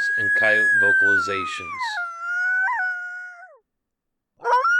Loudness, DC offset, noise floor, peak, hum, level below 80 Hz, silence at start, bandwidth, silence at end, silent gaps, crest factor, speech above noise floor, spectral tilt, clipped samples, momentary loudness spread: -20 LUFS; under 0.1%; -80 dBFS; -6 dBFS; none; -70 dBFS; 0 s; 11 kHz; 0 s; none; 16 dB; 60 dB; -2.5 dB/octave; under 0.1%; 15 LU